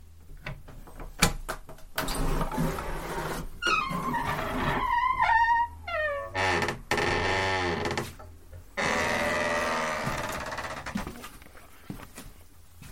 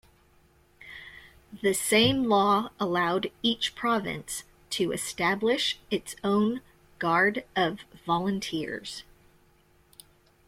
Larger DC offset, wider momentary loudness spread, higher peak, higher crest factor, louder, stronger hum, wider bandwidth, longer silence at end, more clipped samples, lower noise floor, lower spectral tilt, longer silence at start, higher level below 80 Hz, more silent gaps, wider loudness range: first, 0.2% vs under 0.1%; about the same, 18 LU vs 16 LU; first, -6 dBFS vs -10 dBFS; first, 24 dB vs 18 dB; about the same, -28 LUFS vs -27 LUFS; neither; about the same, 16.5 kHz vs 16.5 kHz; second, 0 s vs 1.45 s; neither; second, -53 dBFS vs -62 dBFS; about the same, -3.5 dB/octave vs -3.5 dB/octave; second, 0 s vs 0.8 s; first, -40 dBFS vs -60 dBFS; neither; about the same, 6 LU vs 4 LU